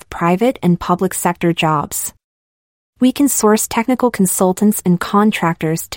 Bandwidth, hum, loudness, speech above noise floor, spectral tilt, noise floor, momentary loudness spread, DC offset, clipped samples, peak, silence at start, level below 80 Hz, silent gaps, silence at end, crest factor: 16.5 kHz; none; -15 LUFS; over 75 dB; -5 dB/octave; under -90 dBFS; 4 LU; under 0.1%; under 0.1%; -2 dBFS; 0.1 s; -48 dBFS; 2.24-2.93 s; 0 s; 12 dB